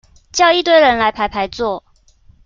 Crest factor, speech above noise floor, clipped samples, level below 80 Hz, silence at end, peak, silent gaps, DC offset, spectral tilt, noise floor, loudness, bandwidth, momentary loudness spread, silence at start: 14 dB; 35 dB; under 0.1%; -44 dBFS; 0.65 s; 0 dBFS; none; under 0.1%; -2.5 dB/octave; -49 dBFS; -14 LUFS; 7.4 kHz; 12 LU; 0.35 s